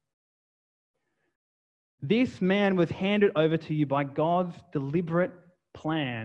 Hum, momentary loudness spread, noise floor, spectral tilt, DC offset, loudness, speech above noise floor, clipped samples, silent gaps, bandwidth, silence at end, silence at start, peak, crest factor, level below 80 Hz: none; 9 LU; under -90 dBFS; -8 dB/octave; under 0.1%; -27 LUFS; over 64 dB; under 0.1%; none; 8 kHz; 0 s; 2 s; -12 dBFS; 18 dB; -68 dBFS